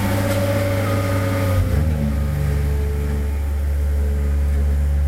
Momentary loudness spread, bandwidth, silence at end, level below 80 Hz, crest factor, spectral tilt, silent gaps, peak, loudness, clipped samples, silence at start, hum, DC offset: 3 LU; 16 kHz; 0 s; -22 dBFS; 12 dB; -7 dB/octave; none; -8 dBFS; -21 LUFS; under 0.1%; 0 s; none; 0.4%